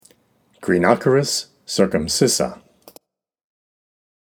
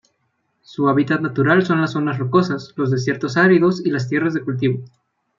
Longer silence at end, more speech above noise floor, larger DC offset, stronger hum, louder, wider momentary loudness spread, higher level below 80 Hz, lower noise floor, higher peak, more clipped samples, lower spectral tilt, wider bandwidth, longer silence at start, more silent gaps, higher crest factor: first, 1.85 s vs 0.5 s; second, 42 dB vs 51 dB; neither; neither; about the same, -19 LUFS vs -18 LUFS; about the same, 10 LU vs 8 LU; first, -52 dBFS vs -62 dBFS; second, -60 dBFS vs -69 dBFS; about the same, 0 dBFS vs -2 dBFS; neither; second, -4 dB/octave vs -7.5 dB/octave; first, over 20 kHz vs 7.4 kHz; about the same, 0.6 s vs 0.7 s; neither; first, 22 dB vs 16 dB